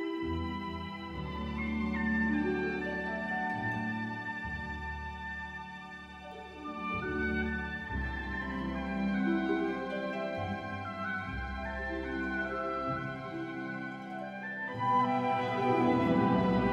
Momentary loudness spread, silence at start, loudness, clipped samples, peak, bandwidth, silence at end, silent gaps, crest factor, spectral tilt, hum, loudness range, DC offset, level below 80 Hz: 12 LU; 0 s; -34 LUFS; under 0.1%; -16 dBFS; 9.4 kHz; 0 s; none; 18 dB; -7.5 dB/octave; none; 5 LU; under 0.1%; -48 dBFS